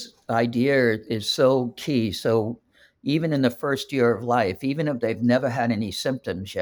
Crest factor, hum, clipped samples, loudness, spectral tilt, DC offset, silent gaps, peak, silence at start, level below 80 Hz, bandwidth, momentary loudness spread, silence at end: 16 dB; none; under 0.1%; -23 LUFS; -6 dB/octave; under 0.1%; none; -8 dBFS; 0 s; -60 dBFS; over 20 kHz; 7 LU; 0 s